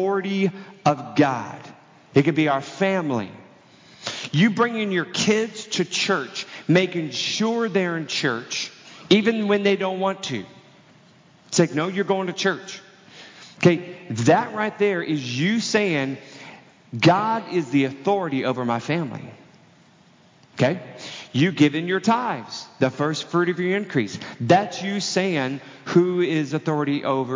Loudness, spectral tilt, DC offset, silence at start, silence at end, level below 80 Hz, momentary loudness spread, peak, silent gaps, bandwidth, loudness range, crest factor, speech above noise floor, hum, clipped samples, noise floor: -22 LUFS; -5 dB/octave; under 0.1%; 0 s; 0 s; -68 dBFS; 13 LU; -2 dBFS; none; 7.8 kHz; 3 LU; 22 dB; 32 dB; none; under 0.1%; -54 dBFS